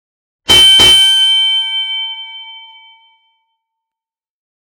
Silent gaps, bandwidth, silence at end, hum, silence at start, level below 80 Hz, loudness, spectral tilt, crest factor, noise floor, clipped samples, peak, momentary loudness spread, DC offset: none; 19 kHz; 2.15 s; none; 0.5 s; -40 dBFS; -6 LUFS; 0 dB/octave; 12 dB; -88 dBFS; under 0.1%; 0 dBFS; 23 LU; under 0.1%